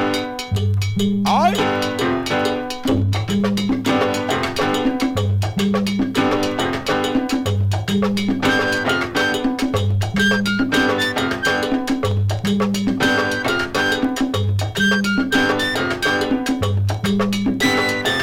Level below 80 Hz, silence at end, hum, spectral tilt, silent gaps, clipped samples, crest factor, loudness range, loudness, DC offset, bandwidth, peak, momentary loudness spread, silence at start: -42 dBFS; 0 s; none; -5 dB/octave; none; under 0.1%; 14 dB; 1 LU; -19 LUFS; under 0.1%; 16.5 kHz; -4 dBFS; 4 LU; 0 s